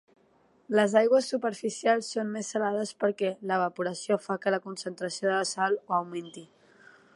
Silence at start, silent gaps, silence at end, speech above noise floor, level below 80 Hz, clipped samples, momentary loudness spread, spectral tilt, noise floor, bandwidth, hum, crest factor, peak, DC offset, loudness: 0.7 s; none; 0.7 s; 36 dB; -82 dBFS; under 0.1%; 11 LU; -4 dB/octave; -64 dBFS; 11.5 kHz; none; 20 dB; -8 dBFS; under 0.1%; -28 LUFS